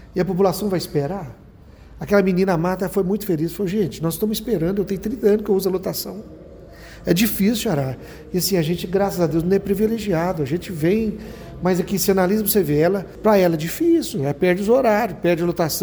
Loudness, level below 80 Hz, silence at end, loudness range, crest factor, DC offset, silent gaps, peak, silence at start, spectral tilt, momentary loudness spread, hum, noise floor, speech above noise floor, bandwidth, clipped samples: -20 LUFS; -44 dBFS; 0 s; 4 LU; 16 dB; under 0.1%; none; -4 dBFS; 0 s; -5.5 dB/octave; 9 LU; none; -44 dBFS; 24 dB; over 20 kHz; under 0.1%